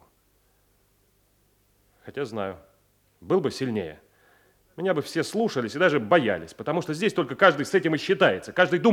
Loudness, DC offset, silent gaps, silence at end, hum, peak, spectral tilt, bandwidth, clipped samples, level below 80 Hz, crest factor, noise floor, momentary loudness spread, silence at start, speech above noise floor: -24 LUFS; under 0.1%; none; 0 s; none; -4 dBFS; -5.5 dB/octave; 16 kHz; under 0.1%; -68 dBFS; 22 dB; -65 dBFS; 13 LU; 2.05 s; 41 dB